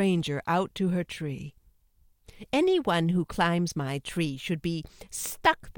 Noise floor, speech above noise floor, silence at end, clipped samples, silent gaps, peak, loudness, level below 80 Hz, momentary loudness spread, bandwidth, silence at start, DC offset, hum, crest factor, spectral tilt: -63 dBFS; 36 dB; 0.05 s; under 0.1%; none; -8 dBFS; -28 LUFS; -54 dBFS; 11 LU; 17.5 kHz; 0 s; under 0.1%; none; 20 dB; -5.5 dB/octave